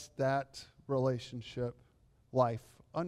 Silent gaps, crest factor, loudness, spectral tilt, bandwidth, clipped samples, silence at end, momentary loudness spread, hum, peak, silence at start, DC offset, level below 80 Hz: none; 18 dB; -36 LUFS; -6.5 dB/octave; 12.5 kHz; under 0.1%; 0 s; 12 LU; none; -18 dBFS; 0 s; under 0.1%; -66 dBFS